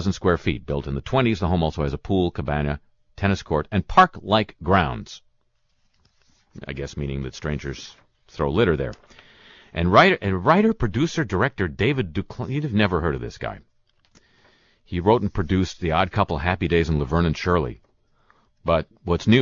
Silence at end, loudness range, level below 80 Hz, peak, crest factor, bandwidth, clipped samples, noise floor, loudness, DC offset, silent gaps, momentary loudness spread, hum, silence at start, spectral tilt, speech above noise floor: 0 s; 7 LU; -38 dBFS; -2 dBFS; 20 dB; 7.4 kHz; under 0.1%; -66 dBFS; -22 LUFS; under 0.1%; none; 14 LU; none; 0 s; -6.5 dB/octave; 44 dB